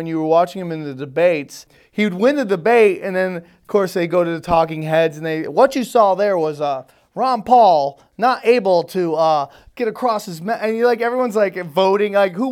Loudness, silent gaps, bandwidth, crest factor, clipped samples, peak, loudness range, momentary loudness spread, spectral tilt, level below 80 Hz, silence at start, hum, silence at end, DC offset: -17 LUFS; none; 16.5 kHz; 16 dB; under 0.1%; 0 dBFS; 2 LU; 11 LU; -6 dB/octave; -54 dBFS; 0 s; none; 0 s; under 0.1%